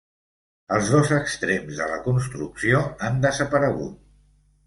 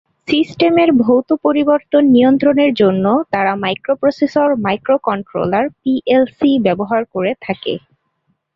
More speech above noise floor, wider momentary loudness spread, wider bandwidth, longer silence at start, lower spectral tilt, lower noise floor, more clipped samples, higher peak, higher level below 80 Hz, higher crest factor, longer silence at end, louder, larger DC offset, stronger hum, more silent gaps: second, 36 dB vs 52 dB; about the same, 8 LU vs 8 LU; first, 11.5 kHz vs 7 kHz; first, 0.7 s vs 0.3 s; second, -5.5 dB/octave vs -7.5 dB/octave; second, -59 dBFS vs -66 dBFS; neither; about the same, -4 dBFS vs -2 dBFS; first, -50 dBFS vs -56 dBFS; about the same, 18 dB vs 14 dB; about the same, 0.7 s vs 0.8 s; second, -23 LUFS vs -14 LUFS; neither; first, 50 Hz at -45 dBFS vs none; neither